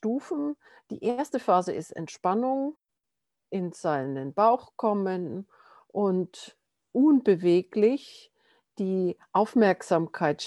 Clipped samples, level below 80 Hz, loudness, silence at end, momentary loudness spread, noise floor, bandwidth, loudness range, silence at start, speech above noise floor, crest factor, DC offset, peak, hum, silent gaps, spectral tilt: under 0.1%; -78 dBFS; -27 LUFS; 0 s; 13 LU; -86 dBFS; 12 kHz; 4 LU; 0.05 s; 60 dB; 18 dB; under 0.1%; -8 dBFS; none; none; -7 dB/octave